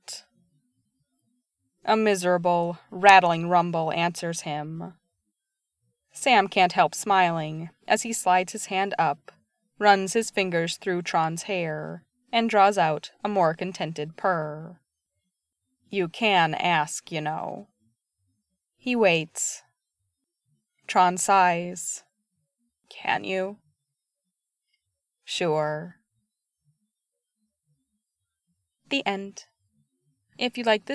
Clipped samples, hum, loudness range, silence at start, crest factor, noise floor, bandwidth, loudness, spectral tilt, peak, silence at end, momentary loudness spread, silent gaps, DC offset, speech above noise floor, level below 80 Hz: under 0.1%; none; 11 LU; 0.1 s; 26 dB; -84 dBFS; 11 kHz; -24 LUFS; -3.5 dB/octave; 0 dBFS; 0 s; 15 LU; none; under 0.1%; 60 dB; -80 dBFS